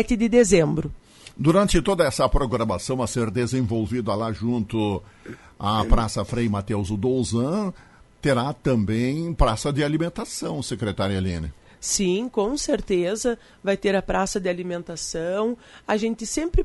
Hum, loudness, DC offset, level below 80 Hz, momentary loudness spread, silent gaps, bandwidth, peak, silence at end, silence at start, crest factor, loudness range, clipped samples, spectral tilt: none; -24 LUFS; under 0.1%; -34 dBFS; 10 LU; none; 11.5 kHz; -4 dBFS; 0 s; 0 s; 20 dB; 3 LU; under 0.1%; -5.5 dB/octave